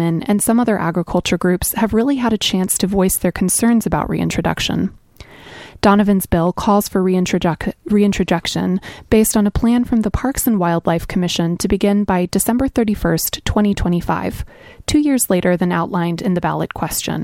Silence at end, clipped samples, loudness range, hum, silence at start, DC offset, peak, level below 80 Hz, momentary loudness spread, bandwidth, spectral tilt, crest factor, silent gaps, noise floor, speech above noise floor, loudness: 0 s; under 0.1%; 2 LU; none; 0 s; under 0.1%; 0 dBFS; -34 dBFS; 6 LU; 17 kHz; -5 dB/octave; 16 dB; none; -40 dBFS; 24 dB; -17 LUFS